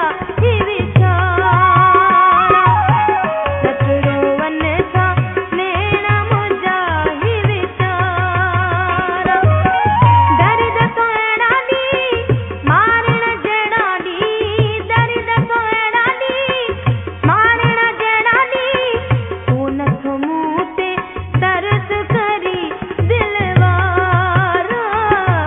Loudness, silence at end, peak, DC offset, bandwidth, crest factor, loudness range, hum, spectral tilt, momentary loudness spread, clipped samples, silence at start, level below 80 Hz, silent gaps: -14 LUFS; 0 s; 0 dBFS; under 0.1%; 3.9 kHz; 14 dB; 5 LU; none; -9 dB/octave; 7 LU; under 0.1%; 0 s; -38 dBFS; none